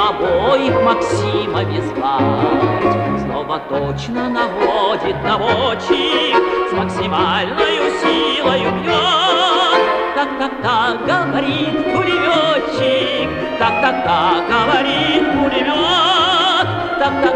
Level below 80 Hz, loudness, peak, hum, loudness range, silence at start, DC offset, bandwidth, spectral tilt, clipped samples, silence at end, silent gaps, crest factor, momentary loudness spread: -42 dBFS; -15 LUFS; 0 dBFS; none; 3 LU; 0 s; under 0.1%; 10.5 kHz; -5 dB/octave; under 0.1%; 0 s; none; 14 dB; 6 LU